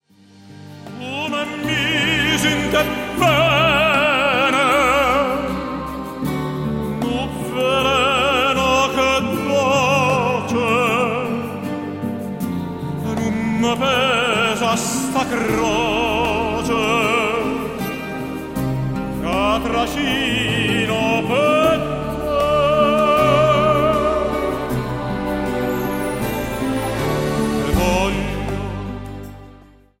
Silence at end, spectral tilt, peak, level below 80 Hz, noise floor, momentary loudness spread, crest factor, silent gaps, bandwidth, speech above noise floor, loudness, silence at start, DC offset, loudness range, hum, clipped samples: 0.45 s; -4.5 dB/octave; -2 dBFS; -36 dBFS; -47 dBFS; 11 LU; 16 dB; none; 16 kHz; 29 dB; -18 LUFS; 0.45 s; under 0.1%; 5 LU; none; under 0.1%